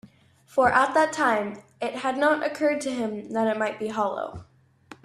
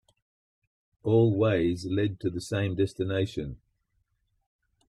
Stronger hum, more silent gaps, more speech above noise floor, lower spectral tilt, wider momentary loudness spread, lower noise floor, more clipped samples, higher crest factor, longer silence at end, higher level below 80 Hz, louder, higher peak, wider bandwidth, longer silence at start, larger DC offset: neither; neither; second, 30 dB vs 48 dB; second, -4.5 dB/octave vs -7.5 dB/octave; about the same, 13 LU vs 11 LU; second, -55 dBFS vs -75 dBFS; neither; about the same, 20 dB vs 16 dB; second, 0.1 s vs 1.35 s; second, -62 dBFS vs -56 dBFS; first, -25 LUFS vs -28 LUFS; first, -6 dBFS vs -12 dBFS; about the same, 13 kHz vs 12 kHz; second, 0.05 s vs 1.05 s; neither